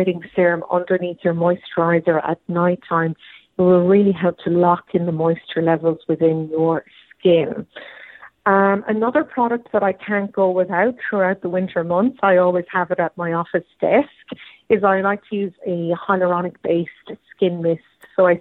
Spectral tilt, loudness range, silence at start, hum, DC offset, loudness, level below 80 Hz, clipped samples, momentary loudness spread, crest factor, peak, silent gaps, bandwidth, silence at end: -10 dB/octave; 3 LU; 0 s; none; under 0.1%; -19 LUFS; -62 dBFS; under 0.1%; 10 LU; 18 dB; -2 dBFS; none; 4.1 kHz; 0 s